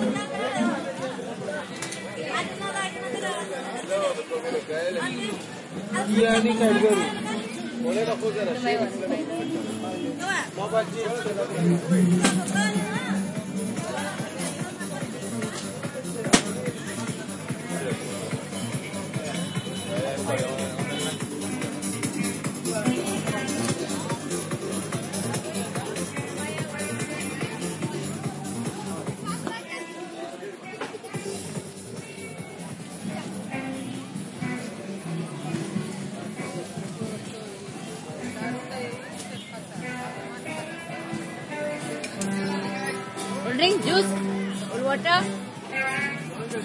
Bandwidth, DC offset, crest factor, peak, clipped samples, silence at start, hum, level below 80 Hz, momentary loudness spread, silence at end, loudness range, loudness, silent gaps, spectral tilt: 11.5 kHz; under 0.1%; 28 dB; 0 dBFS; under 0.1%; 0 s; none; -64 dBFS; 13 LU; 0 s; 10 LU; -28 LUFS; none; -4.5 dB/octave